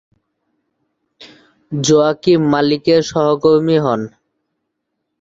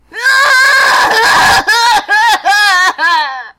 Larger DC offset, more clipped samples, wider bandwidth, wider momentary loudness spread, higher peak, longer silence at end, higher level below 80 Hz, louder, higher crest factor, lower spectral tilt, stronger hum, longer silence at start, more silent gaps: neither; neither; second, 8 kHz vs 16.5 kHz; first, 8 LU vs 4 LU; about the same, -2 dBFS vs -2 dBFS; first, 1.15 s vs 0.1 s; second, -54 dBFS vs -42 dBFS; second, -14 LUFS vs -7 LUFS; first, 16 dB vs 8 dB; first, -5.5 dB/octave vs 0 dB/octave; neither; first, 1.2 s vs 0.15 s; neither